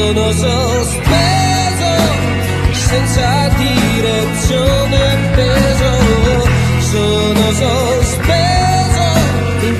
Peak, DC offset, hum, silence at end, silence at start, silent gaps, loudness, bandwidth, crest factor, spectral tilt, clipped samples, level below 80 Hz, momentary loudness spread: 0 dBFS; under 0.1%; none; 0 s; 0 s; none; -12 LUFS; 14.5 kHz; 12 dB; -5 dB/octave; under 0.1%; -20 dBFS; 3 LU